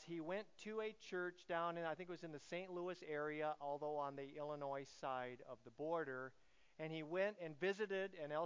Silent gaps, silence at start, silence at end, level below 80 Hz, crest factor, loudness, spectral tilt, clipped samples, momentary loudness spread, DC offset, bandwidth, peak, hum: none; 0 s; 0 s; -86 dBFS; 18 dB; -47 LUFS; -5.5 dB/octave; under 0.1%; 8 LU; under 0.1%; 7.6 kHz; -30 dBFS; none